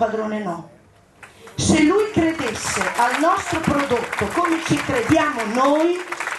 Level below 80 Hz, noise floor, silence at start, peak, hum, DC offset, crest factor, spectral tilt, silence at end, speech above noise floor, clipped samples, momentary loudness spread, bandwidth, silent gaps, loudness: -46 dBFS; -48 dBFS; 0 s; -6 dBFS; none; under 0.1%; 14 dB; -4.5 dB/octave; 0 s; 29 dB; under 0.1%; 8 LU; 13 kHz; none; -19 LUFS